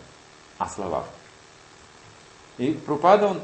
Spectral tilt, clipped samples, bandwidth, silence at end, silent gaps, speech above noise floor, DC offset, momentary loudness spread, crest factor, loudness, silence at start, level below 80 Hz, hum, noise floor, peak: -6 dB/octave; under 0.1%; 8.4 kHz; 0 s; none; 28 dB; under 0.1%; 18 LU; 24 dB; -24 LUFS; 0 s; -60 dBFS; none; -50 dBFS; -2 dBFS